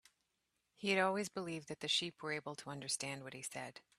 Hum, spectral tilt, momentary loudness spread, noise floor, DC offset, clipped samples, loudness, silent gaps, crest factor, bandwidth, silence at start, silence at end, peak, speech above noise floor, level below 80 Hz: none; -2.5 dB/octave; 11 LU; -85 dBFS; under 0.1%; under 0.1%; -40 LUFS; none; 24 dB; 14 kHz; 0.8 s; 0.2 s; -18 dBFS; 44 dB; -82 dBFS